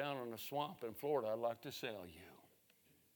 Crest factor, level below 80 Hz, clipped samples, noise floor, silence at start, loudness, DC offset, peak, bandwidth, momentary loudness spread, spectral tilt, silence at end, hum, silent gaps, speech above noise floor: 18 dB; -86 dBFS; under 0.1%; -73 dBFS; 0 s; -44 LUFS; under 0.1%; -28 dBFS; 19.5 kHz; 16 LU; -5 dB/octave; 0.7 s; none; none; 29 dB